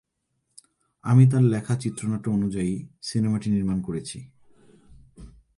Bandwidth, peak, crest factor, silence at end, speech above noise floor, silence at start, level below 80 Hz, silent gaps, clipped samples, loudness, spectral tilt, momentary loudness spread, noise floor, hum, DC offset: 11.5 kHz; -6 dBFS; 18 dB; 0.3 s; 53 dB; 1.05 s; -52 dBFS; none; under 0.1%; -24 LUFS; -7.5 dB/octave; 15 LU; -76 dBFS; none; under 0.1%